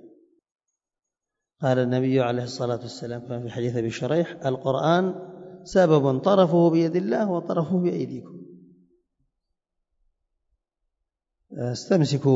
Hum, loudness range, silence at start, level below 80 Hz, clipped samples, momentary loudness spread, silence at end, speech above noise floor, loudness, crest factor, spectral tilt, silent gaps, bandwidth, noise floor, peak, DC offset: none; 10 LU; 0 s; -64 dBFS; under 0.1%; 14 LU; 0 s; 65 dB; -23 LUFS; 18 dB; -7 dB/octave; none; 8 kHz; -88 dBFS; -6 dBFS; under 0.1%